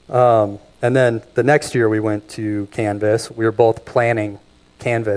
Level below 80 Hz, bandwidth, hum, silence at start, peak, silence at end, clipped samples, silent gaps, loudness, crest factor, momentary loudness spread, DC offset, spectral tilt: -54 dBFS; 11 kHz; none; 0.1 s; 0 dBFS; 0 s; under 0.1%; none; -18 LUFS; 18 dB; 9 LU; under 0.1%; -6.5 dB/octave